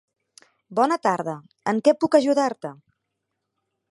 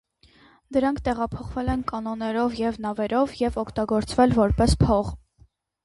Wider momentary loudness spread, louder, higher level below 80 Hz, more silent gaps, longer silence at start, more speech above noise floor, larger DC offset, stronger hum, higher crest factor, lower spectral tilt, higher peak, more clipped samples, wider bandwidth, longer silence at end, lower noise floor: first, 13 LU vs 9 LU; about the same, -22 LUFS vs -24 LUFS; second, -74 dBFS vs -36 dBFS; neither; about the same, 0.7 s vs 0.7 s; first, 58 dB vs 36 dB; neither; neither; about the same, 20 dB vs 18 dB; about the same, -5.5 dB/octave vs -6.5 dB/octave; about the same, -4 dBFS vs -6 dBFS; neither; about the same, 11.5 kHz vs 11.5 kHz; first, 1.2 s vs 0.65 s; first, -80 dBFS vs -59 dBFS